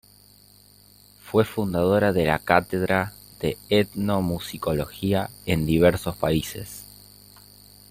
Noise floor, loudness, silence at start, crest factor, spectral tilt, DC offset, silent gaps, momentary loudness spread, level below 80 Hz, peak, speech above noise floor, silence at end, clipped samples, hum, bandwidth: -53 dBFS; -23 LUFS; 1.25 s; 22 dB; -6 dB/octave; under 0.1%; none; 11 LU; -48 dBFS; -2 dBFS; 31 dB; 1.05 s; under 0.1%; 50 Hz at -50 dBFS; 16 kHz